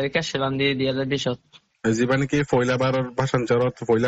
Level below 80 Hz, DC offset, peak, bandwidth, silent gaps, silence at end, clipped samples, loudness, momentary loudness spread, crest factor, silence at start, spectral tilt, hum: -52 dBFS; under 0.1%; -8 dBFS; 8.4 kHz; none; 0 s; under 0.1%; -23 LUFS; 4 LU; 16 dB; 0 s; -5.5 dB/octave; none